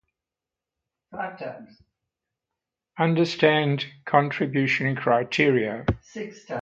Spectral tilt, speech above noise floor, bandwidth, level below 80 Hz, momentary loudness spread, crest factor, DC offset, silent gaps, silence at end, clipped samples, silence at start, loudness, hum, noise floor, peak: -6.5 dB/octave; 65 dB; 8 kHz; -50 dBFS; 17 LU; 22 dB; under 0.1%; none; 0 s; under 0.1%; 1.1 s; -23 LUFS; none; -89 dBFS; -4 dBFS